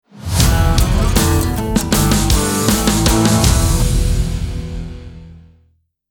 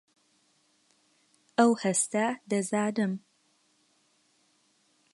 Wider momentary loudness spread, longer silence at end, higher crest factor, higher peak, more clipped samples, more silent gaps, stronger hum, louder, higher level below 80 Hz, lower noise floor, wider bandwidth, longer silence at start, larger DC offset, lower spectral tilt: first, 12 LU vs 9 LU; second, 0.7 s vs 1.95 s; second, 14 dB vs 24 dB; first, 0 dBFS vs -8 dBFS; neither; neither; neither; first, -15 LUFS vs -28 LUFS; first, -20 dBFS vs -82 dBFS; second, -58 dBFS vs -69 dBFS; first, 19 kHz vs 11.5 kHz; second, 0.15 s vs 1.6 s; neither; about the same, -4.5 dB/octave vs -4.5 dB/octave